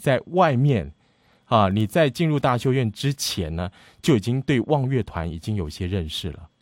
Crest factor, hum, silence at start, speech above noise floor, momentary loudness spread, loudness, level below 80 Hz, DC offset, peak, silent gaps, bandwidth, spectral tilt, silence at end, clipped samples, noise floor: 18 dB; none; 0 s; 39 dB; 10 LU; -23 LUFS; -44 dBFS; under 0.1%; -4 dBFS; none; 16.5 kHz; -6 dB/octave; 0.15 s; under 0.1%; -61 dBFS